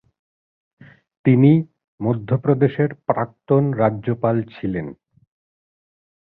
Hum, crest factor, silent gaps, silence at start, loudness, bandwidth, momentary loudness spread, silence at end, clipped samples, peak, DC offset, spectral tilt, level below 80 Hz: none; 18 dB; 1.84-1.98 s; 1.25 s; -19 LUFS; 4.2 kHz; 12 LU; 1.3 s; under 0.1%; -2 dBFS; under 0.1%; -13 dB/octave; -56 dBFS